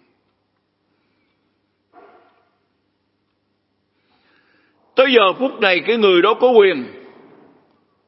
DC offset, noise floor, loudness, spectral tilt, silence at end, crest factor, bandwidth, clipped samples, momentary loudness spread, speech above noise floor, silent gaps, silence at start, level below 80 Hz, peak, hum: under 0.1%; -68 dBFS; -14 LUFS; -7.5 dB/octave; 1.2 s; 20 dB; 5.8 kHz; under 0.1%; 9 LU; 54 dB; none; 4.95 s; -78 dBFS; 0 dBFS; none